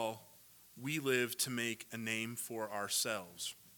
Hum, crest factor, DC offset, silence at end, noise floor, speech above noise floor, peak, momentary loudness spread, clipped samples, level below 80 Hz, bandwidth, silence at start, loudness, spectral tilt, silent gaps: none; 22 dB; under 0.1%; 0 s; -62 dBFS; 23 dB; -18 dBFS; 10 LU; under 0.1%; -84 dBFS; 19 kHz; 0 s; -38 LUFS; -2.5 dB/octave; none